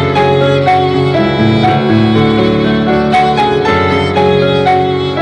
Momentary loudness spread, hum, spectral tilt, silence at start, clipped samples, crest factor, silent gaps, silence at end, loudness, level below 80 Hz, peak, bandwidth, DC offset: 2 LU; none; -7 dB/octave; 0 s; under 0.1%; 10 dB; none; 0 s; -10 LUFS; -36 dBFS; 0 dBFS; 10.5 kHz; under 0.1%